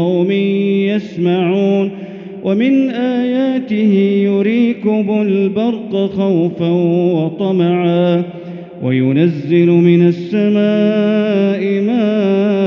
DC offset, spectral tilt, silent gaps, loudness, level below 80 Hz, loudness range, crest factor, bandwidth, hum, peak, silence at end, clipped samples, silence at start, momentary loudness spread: under 0.1%; -7 dB/octave; none; -14 LUFS; -62 dBFS; 2 LU; 12 dB; 6.2 kHz; none; 0 dBFS; 0 s; under 0.1%; 0 s; 6 LU